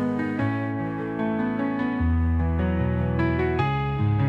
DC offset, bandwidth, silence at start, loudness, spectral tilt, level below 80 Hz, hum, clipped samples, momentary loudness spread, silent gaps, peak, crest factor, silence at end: under 0.1%; 5.4 kHz; 0 s; -25 LUFS; -9.5 dB/octave; -38 dBFS; none; under 0.1%; 4 LU; none; -10 dBFS; 12 dB; 0 s